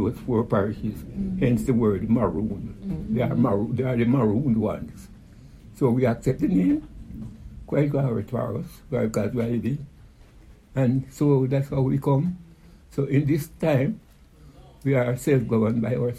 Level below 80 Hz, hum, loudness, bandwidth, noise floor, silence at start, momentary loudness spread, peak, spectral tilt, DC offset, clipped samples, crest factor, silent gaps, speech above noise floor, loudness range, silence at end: -46 dBFS; none; -24 LUFS; 14.5 kHz; -50 dBFS; 0 s; 12 LU; -8 dBFS; -8.5 dB/octave; under 0.1%; under 0.1%; 16 dB; none; 27 dB; 3 LU; 0 s